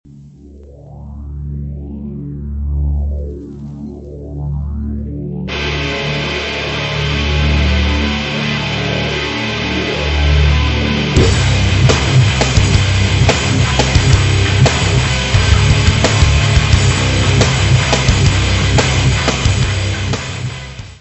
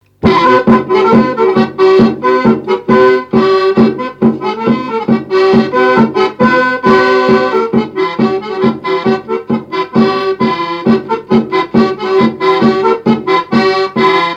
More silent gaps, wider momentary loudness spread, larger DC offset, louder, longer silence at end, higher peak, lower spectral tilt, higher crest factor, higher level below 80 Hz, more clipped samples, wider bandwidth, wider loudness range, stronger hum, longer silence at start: neither; first, 14 LU vs 6 LU; neither; second, -14 LUFS vs -11 LUFS; about the same, 0.05 s vs 0 s; about the same, 0 dBFS vs 0 dBFS; second, -4.5 dB/octave vs -7 dB/octave; about the same, 14 dB vs 10 dB; first, -20 dBFS vs -44 dBFS; second, under 0.1% vs 0.2%; first, 8.4 kHz vs 7.6 kHz; first, 11 LU vs 4 LU; neither; about the same, 0.1 s vs 0.2 s